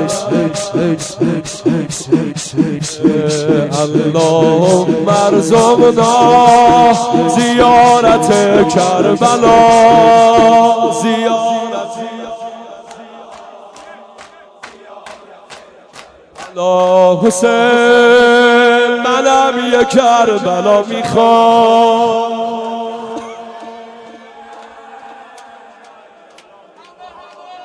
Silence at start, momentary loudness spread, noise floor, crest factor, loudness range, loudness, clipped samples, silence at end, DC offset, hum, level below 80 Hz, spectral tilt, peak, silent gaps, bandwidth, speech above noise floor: 0 s; 15 LU; -42 dBFS; 12 dB; 13 LU; -10 LUFS; under 0.1%; 0 s; under 0.1%; none; -46 dBFS; -4.5 dB/octave; 0 dBFS; none; 11 kHz; 32 dB